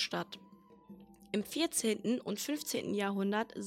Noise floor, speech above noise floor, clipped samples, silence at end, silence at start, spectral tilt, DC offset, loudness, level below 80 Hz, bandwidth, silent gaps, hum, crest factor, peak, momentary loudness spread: -56 dBFS; 21 dB; under 0.1%; 0 s; 0 s; -3.5 dB/octave; under 0.1%; -35 LUFS; -76 dBFS; 16 kHz; none; none; 18 dB; -18 dBFS; 19 LU